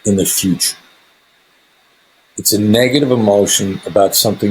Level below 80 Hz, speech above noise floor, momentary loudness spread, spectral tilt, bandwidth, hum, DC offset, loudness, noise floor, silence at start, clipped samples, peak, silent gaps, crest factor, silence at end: -54 dBFS; 40 dB; 6 LU; -3.5 dB/octave; over 20 kHz; none; under 0.1%; -13 LUFS; -53 dBFS; 0.05 s; under 0.1%; 0 dBFS; none; 14 dB; 0 s